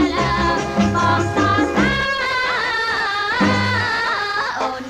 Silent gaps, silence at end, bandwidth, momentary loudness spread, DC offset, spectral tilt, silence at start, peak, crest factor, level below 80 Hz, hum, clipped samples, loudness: none; 0 s; 15 kHz; 3 LU; under 0.1%; -5 dB/octave; 0 s; -4 dBFS; 14 dB; -38 dBFS; none; under 0.1%; -18 LUFS